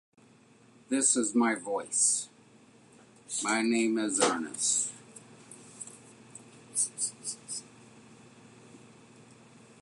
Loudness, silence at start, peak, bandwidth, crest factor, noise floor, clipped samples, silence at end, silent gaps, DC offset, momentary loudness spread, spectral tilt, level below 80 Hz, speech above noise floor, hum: -29 LUFS; 0.9 s; -10 dBFS; 11.5 kHz; 22 dB; -59 dBFS; under 0.1%; 0.95 s; none; under 0.1%; 25 LU; -1.5 dB/octave; -80 dBFS; 31 dB; none